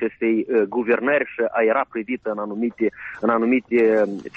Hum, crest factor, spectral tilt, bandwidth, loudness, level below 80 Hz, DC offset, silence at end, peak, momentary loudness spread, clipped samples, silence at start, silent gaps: none; 14 dB; -8 dB/octave; 6.2 kHz; -21 LUFS; -64 dBFS; under 0.1%; 0.1 s; -8 dBFS; 8 LU; under 0.1%; 0 s; none